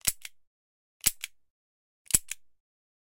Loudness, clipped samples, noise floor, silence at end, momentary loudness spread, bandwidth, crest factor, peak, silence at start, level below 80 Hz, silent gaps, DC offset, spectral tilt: -28 LUFS; under 0.1%; under -90 dBFS; 0.75 s; 17 LU; 17 kHz; 30 dB; -4 dBFS; 0.05 s; -54 dBFS; 0.47-1.00 s, 1.50-2.05 s; under 0.1%; 0.5 dB/octave